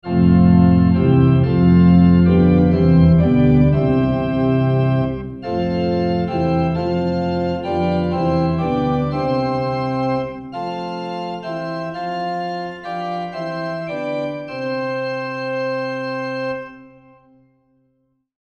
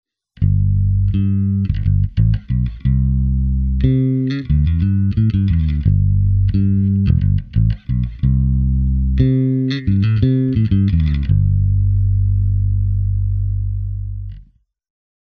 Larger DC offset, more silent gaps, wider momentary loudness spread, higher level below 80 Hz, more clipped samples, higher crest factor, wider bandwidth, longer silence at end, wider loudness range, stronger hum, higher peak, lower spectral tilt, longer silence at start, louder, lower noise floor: neither; neither; first, 14 LU vs 5 LU; second, -36 dBFS vs -22 dBFS; neither; about the same, 16 dB vs 14 dB; first, 5.6 kHz vs 4.7 kHz; first, 1.7 s vs 0.95 s; first, 12 LU vs 2 LU; neither; about the same, -2 dBFS vs 0 dBFS; about the same, -9.5 dB/octave vs -10.5 dB/octave; second, 0.05 s vs 0.4 s; about the same, -18 LUFS vs -17 LUFS; first, -66 dBFS vs -49 dBFS